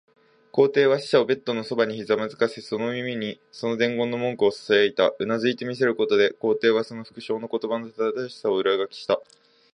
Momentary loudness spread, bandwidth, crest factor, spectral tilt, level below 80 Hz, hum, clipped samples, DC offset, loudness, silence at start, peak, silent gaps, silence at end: 9 LU; 10.5 kHz; 20 dB; -5.5 dB/octave; -70 dBFS; none; under 0.1%; under 0.1%; -24 LUFS; 0.55 s; -4 dBFS; none; 0.5 s